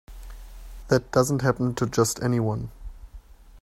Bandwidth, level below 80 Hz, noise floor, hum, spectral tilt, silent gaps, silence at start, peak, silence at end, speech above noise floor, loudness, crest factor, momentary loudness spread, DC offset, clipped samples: 15.5 kHz; -44 dBFS; -46 dBFS; none; -5.5 dB/octave; none; 0.1 s; -6 dBFS; 0.05 s; 23 dB; -24 LUFS; 20 dB; 23 LU; under 0.1%; under 0.1%